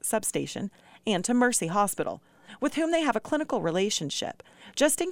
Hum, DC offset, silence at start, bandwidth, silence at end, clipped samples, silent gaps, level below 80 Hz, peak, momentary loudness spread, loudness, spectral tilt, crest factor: none; under 0.1%; 0.05 s; 18 kHz; 0 s; under 0.1%; none; -64 dBFS; -10 dBFS; 13 LU; -28 LUFS; -3.5 dB/octave; 18 dB